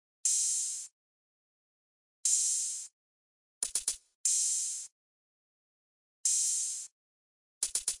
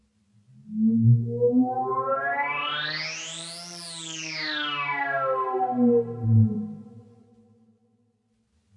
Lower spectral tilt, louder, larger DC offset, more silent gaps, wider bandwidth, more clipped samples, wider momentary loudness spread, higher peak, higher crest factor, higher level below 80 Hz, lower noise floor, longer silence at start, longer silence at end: second, 4.5 dB/octave vs -6 dB/octave; second, -30 LUFS vs -25 LUFS; neither; first, 0.92-2.24 s, 2.92-3.61 s, 4.15-4.24 s, 4.92-6.24 s, 6.92-7.61 s vs none; about the same, 11.5 kHz vs 11.5 kHz; neither; about the same, 13 LU vs 13 LU; second, -14 dBFS vs -10 dBFS; first, 22 dB vs 16 dB; second, -74 dBFS vs -66 dBFS; first, under -90 dBFS vs -69 dBFS; second, 0.25 s vs 0.65 s; second, 0.05 s vs 1.75 s